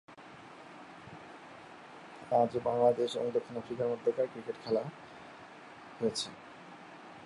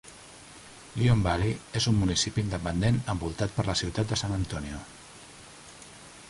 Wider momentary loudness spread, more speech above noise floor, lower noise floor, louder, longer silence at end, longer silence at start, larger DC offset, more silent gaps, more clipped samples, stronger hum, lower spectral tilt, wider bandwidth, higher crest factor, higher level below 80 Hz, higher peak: about the same, 22 LU vs 22 LU; about the same, 20 dB vs 22 dB; about the same, -52 dBFS vs -49 dBFS; second, -33 LUFS vs -28 LUFS; about the same, 0 s vs 0 s; about the same, 0.1 s vs 0.05 s; neither; neither; neither; neither; about the same, -5 dB/octave vs -5 dB/octave; about the same, 11.5 kHz vs 11.5 kHz; about the same, 22 dB vs 18 dB; second, -74 dBFS vs -44 dBFS; about the same, -14 dBFS vs -12 dBFS